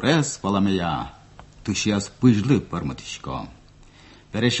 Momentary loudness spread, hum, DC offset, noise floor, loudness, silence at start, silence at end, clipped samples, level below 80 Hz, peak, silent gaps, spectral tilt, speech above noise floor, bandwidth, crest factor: 14 LU; none; under 0.1%; -49 dBFS; -23 LUFS; 0 s; 0 s; under 0.1%; -46 dBFS; -4 dBFS; none; -5 dB/octave; 27 dB; 8.4 kHz; 20 dB